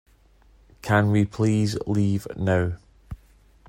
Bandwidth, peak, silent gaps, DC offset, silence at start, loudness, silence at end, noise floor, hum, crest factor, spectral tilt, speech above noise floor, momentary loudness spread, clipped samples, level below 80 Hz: 13.5 kHz; -6 dBFS; none; under 0.1%; 0.85 s; -23 LUFS; 0.55 s; -56 dBFS; none; 18 dB; -7 dB/octave; 34 dB; 22 LU; under 0.1%; -50 dBFS